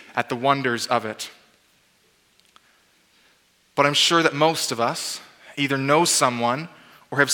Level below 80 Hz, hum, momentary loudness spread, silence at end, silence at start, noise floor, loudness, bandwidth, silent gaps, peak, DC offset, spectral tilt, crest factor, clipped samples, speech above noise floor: -76 dBFS; none; 16 LU; 0 s; 0.15 s; -62 dBFS; -21 LUFS; 19 kHz; none; -2 dBFS; under 0.1%; -3 dB/octave; 22 dB; under 0.1%; 40 dB